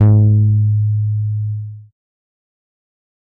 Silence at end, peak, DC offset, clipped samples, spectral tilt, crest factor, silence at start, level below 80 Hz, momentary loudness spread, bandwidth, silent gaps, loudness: 1.5 s; -4 dBFS; under 0.1%; under 0.1%; -14 dB/octave; 12 dB; 0 s; -46 dBFS; 14 LU; 1.6 kHz; none; -15 LUFS